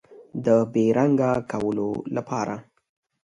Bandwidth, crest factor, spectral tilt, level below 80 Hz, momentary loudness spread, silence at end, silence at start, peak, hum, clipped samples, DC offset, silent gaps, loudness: 10.5 kHz; 18 dB; -8 dB/octave; -60 dBFS; 10 LU; 0.65 s; 0.1 s; -6 dBFS; none; under 0.1%; under 0.1%; none; -23 LUFS